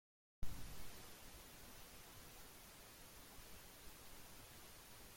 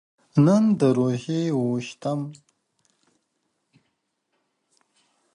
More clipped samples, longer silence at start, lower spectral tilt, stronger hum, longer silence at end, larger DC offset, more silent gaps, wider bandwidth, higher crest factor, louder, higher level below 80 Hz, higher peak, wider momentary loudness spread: neither; about the same, 0.4 s vs 0.35 s; second, -3 dB/octave vs -8 dB/octave; neither; second, 0 s vs 3 s; neither; neither; first, 16.5 kHz vs 11 kHz; about the same, 20 dB vs 18 dB; second, -58 LUFS vs -22 LUFS; first, -60 dBFS vs -66 dBFS; second, -30 dBFS vs -6 dBFS; second, 3 LU vs 11 LU